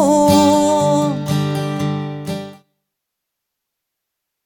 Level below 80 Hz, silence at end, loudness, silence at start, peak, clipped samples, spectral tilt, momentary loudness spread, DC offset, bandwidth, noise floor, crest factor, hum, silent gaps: -52 dBFS; 1.9 s; -16 LUFS; 0 s; 0 dBFS; under 0.1%; -6 dB/octave; 15 LU; under 0.1%; 18.5 kHz; -79 dBFS; 16 dB; none; none